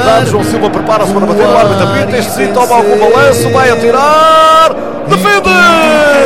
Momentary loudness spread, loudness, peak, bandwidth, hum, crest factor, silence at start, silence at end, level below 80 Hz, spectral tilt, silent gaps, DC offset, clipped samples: 7 LU; -7 LUFS; 0 dBFS; 16.5 kHz; none; 8 dB; 0 s; 0 s; -38 dBFS; -4.5 dB/octave; none; 4%; 0.9%